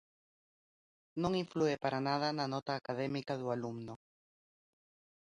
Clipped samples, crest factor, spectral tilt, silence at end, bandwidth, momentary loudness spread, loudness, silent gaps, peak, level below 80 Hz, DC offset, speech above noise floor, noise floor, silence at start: under 0.1%; 20 dB; -6 dB/octave; 1.25 s; 11 kHz; 13 LU; -37 LUFS; 2.62-2.66 s; -20 dBFS; -72 dBFS; under 0.1%; over 54 dB; under -90 dBFS; 1.15 s